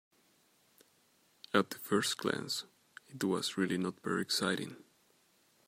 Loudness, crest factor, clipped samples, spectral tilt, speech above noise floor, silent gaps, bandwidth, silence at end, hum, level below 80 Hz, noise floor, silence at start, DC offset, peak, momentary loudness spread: -34 LUFS; 26 dB; under 0.1%; -4 dB/octave; 36 dB; none; 16 kHz; 0.9 s; none; -82 dBFS; -70 dBFS; 1.55 s; under 0.1%; -12 dBFS; 11 LU